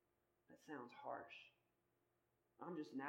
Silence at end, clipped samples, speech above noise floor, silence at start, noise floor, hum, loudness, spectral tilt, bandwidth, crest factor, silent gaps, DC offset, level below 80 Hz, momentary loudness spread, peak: 0 s; under 0.1%; 34 dB; 0.5 s; -86 dBFS; none; -55 LUFS; -6 dB/octave; 16.5 kHz; 22 dB; none; under 0.1%; under -90 dBFS; 12 LU; -34 dBFS